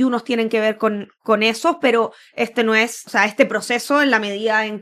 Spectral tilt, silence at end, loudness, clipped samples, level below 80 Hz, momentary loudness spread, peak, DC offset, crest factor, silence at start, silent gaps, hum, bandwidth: -3.5 dB/octave; 0 s; -18 LUFS; under 0.1%; -72 dBFS; 6 LU; 0 dBFS; under 0.1%; 18 dB; 0 s; none; none; 14.5 kHz